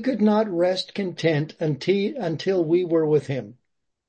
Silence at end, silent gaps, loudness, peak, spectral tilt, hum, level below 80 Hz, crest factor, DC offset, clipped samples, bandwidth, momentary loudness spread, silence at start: 0.55 s; none; -23 LUFS; -8 dBFS; -7 dB/octave; none; -68 dBFS; 14 dB; under 0.1%; under 0.1%; 8.8 kHz; 8 LU; 0 s